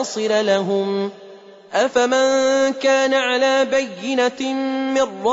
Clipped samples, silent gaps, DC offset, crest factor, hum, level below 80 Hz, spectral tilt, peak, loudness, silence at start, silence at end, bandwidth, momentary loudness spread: under 0.1%; none; under 0.1%; 14 dB; none; -64 dBFS; -3.5 dB/octave; -6 dBFS; -18 LUFS; 0 s; 0 s; 8 kHz; 7 LU